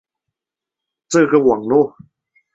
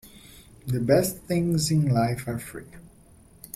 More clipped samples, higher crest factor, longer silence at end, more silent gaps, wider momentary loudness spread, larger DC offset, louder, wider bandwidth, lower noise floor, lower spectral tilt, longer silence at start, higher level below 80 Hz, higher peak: neither; about the same, 16 dB vs 18 dB; about the same, 0.65 s vs 0.7 s; neither; second, 6 LU vs 17 LU; neither; first, -15 LUFS vs -25 LUFS; second, 8 kHz vs 16.5 kHz; first, -86 dBFS vs -53 dBFS; about the same, -5.5 dB/octave vs -6 dB/octave; first, 1.1 s vs 0.05 s; second, -60 dBFS vs -52 dBFS; first, -2 dBFS vs -8 dBFS